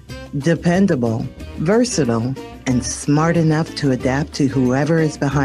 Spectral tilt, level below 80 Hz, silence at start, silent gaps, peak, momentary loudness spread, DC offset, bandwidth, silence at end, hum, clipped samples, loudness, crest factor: -6 dB/octave; -40 dBFS; 0.1 s; none; -4 dBFS; 8 LU; under 0.1%; 12 kHz; 0 s; none; under 0.1%; -18 LUFS; 14 dB